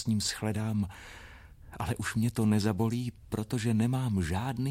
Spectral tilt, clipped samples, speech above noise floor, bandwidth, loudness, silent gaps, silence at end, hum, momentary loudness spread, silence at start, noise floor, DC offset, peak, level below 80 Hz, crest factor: -6 dB/octave; under 0.1%; 20 dB; 16 kHz; -31 LUFS; none; 0 s; none; 18 LU; 0 s; -50 dBFS; under 0.1%; -14 dBFS; -52 dBFS; 18 dB